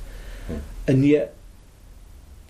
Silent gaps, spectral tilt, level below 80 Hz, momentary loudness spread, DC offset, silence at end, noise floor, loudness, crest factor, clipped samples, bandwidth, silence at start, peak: none; -8.5 dB/octave; -38 dBFS; 21 LU; under 0.1%; 0.15 s; -46 dBFS; -22 LUFS; 18 dB; under 0.1%; 14 kHz; 0 s; -8 dBFS